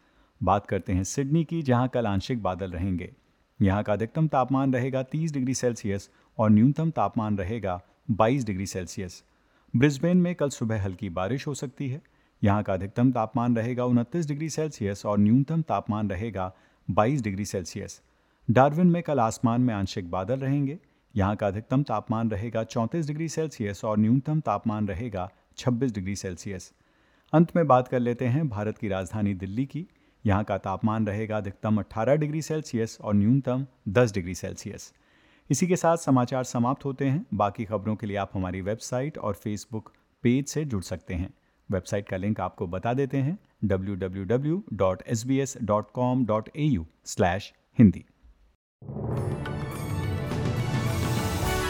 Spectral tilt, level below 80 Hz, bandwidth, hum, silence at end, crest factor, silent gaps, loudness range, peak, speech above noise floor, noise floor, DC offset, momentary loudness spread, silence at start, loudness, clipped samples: -7 dB/octave; -50 dBFS; 17.5 kHz; none; 0 s; 22 dB; 48.55-48.79 s; 4 LU; -4 dBFS; 37 dB; -63 dBFS; under 0.1%; 11 LU; 0.4 s; -27 LUFS; under 0.1%